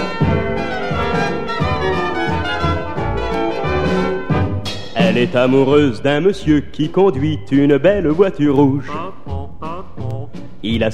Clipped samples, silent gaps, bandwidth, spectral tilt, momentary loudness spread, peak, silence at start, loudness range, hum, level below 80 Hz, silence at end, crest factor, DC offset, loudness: under 0.1%; none; 10.5 kHz; -7 dB/octave; 14 LU; 0 dBFS; 0 s; 5 LU; none; -34 dBFS; 0 s; 16 dB; 4%; -17 LUFS